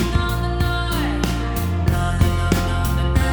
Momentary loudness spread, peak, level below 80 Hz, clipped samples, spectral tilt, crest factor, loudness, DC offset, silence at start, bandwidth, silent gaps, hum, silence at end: 3 LU; -2 dBFS; -24 dBFS; under 0.1%; -6 dB/octave; 16 dB; -21 LUFS; under 0.1%; 0 s; over 20 kHz; none; none; 0 s